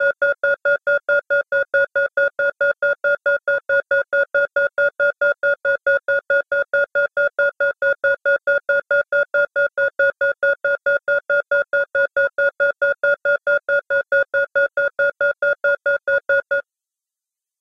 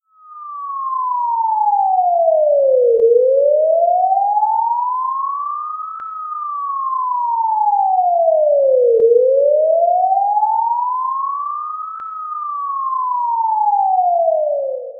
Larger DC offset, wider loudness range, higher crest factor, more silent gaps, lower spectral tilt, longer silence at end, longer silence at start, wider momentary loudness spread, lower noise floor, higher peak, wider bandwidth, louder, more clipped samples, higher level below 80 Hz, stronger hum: neither; second, 0 LU vs 6 LU; about the same, 12 dB vs 12 dB; neither; second, -4 dB/octave vs -8.5 dB/octave; first, 1 s vs 0 s; second, 0 s vs 0.3 s; second, 1 LU vs 12 LU; first, -87 dBFS vs -36 dBFS; second, -6 dBFS vs -2 dBFS; first, 5.8 kHz vs 1.8 kHz; second, -19 LUFS vs -16 LUFS; neither; first, -66 dBFS vs -72 dBFS; neither